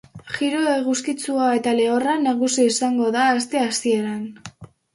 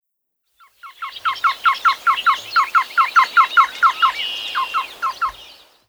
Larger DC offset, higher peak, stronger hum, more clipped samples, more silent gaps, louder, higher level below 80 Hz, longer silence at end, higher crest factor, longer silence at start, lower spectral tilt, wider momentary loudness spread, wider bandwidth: neither; second, -6 dBFS vs -2 dBFS; neither; neither; neither; second, -20 LUFS vs -17 LUFS; about the same, -64 dBFS vs -60 dBFS; second, 0.3 s vs 0.45 s; about the same, 14 dB vs 16 dB; second, 0.15 s vs 0.85 s; first, -3 dB/octave vs 1 dB/octave; about the same, 11 LU vs 11 LU; second, 11.5 kHz vs over 20 kHz